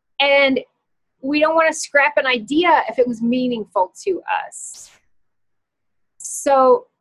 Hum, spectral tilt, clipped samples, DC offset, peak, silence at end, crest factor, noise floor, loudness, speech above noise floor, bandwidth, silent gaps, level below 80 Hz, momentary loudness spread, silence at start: none; -2.5 dB/octave; under 0.1%; under 0.1%; -2 dBFS; 0.15 s; 18 dB; -76 dBFS; -17 LUFS; 58 dB; 12.5 kHz; none; -62 dBFS; 14 LU; 0.2 s